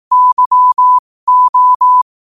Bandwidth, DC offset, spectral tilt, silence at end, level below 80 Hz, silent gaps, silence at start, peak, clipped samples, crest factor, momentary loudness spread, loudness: 1.3 kHz; 0.3%; -1 dB/octave; 0.2 s; -64 dBFS; 0.33-0.37 s, 0.46-0.51 s, 0.99-1.27 s, 1.49-1.53 s, 1.75-1.80 s; 0.1 s; -4 dBFS; under 0.1%; 6 dB; 3 LU; -9 LUFS